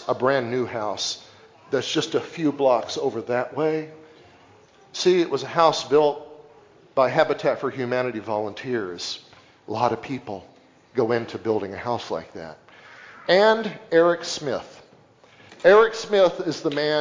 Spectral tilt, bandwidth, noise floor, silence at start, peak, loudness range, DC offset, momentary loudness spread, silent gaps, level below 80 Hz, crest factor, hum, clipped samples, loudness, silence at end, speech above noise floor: -4.5 dB/octave; 7.6 kHz; -53 dBFS; 0 s; -4 dBFS; 7 LU; under 0.1%; 14 LU; none; -64 dBFS; 20 dB; none; under 0.1%; -23 LUFS; 0 s; 31 dB